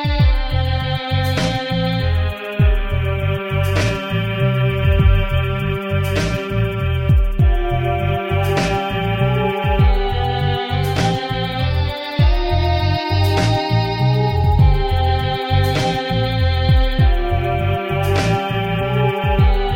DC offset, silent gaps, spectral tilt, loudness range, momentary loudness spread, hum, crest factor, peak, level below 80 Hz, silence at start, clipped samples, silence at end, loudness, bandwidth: under 0.1%; none; -6.5 dB/octave; 2 LU; 4 LU; none; 14 dB; -2 dBFS; -22 dBFS; 0 s; under 0.1%; 0 s; -18 LUFS; 16.5 kHz